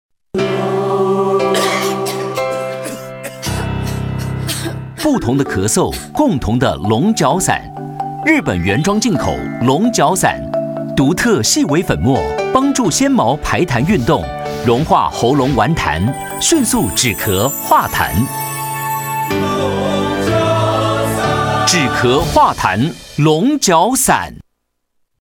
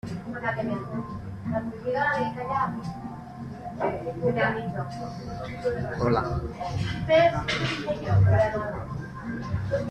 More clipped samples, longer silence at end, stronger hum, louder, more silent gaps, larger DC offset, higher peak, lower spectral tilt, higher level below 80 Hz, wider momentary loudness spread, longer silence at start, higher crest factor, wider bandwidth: neither; first, 0.85 s vs 0 s; neither; first, -15 LUFS vs -27 LUFS; neither; neither; first, 0 dBFS vs -8 dBFS; second, -4.5 dB/octave vs -7 dB/octave; first, -36 dBFS vs -46 dBFS; second, 8 LU vs 14 LU; first, 0.35 s vs 0.05 s; about the same, 14 dB vs 18 dB; first, 18 kHz vs 9.4 kHz